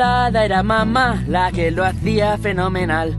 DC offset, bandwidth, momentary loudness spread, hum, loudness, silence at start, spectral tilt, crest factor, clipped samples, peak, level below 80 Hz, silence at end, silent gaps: under 0.1%; 12.5 kHz; 4 LU; none; -17 LUFS; 0 s; -6.5 dB/octave; 12 dB; under 0.1%; -4 dBFS; -30 dBFS; 0 s; none